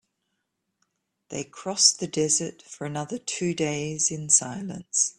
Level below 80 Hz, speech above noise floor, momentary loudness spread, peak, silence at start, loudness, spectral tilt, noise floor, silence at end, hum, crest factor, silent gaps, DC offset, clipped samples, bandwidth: -66 dBFS; 52 dB; 16 LU; -2 dBFS; 1.3 s; -24 LUFS; -2 dB/octave; -79 dBFS; 0.05 s; none; 26 dB; none; under 0.1%; under 0.1%; 12.5 kHz